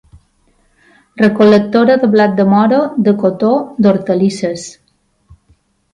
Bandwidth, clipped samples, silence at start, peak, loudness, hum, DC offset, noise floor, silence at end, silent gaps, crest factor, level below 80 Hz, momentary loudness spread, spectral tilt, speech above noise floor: 9.8 kHz; under 0.1%; 1.15 s; 0 dBFS; -12 LUFS; none; under 0.1%; -59 dBFS; 1.2 s; none; 12 dB; -54 dBFS; 8 LU; -7 dB/octave; 48 dB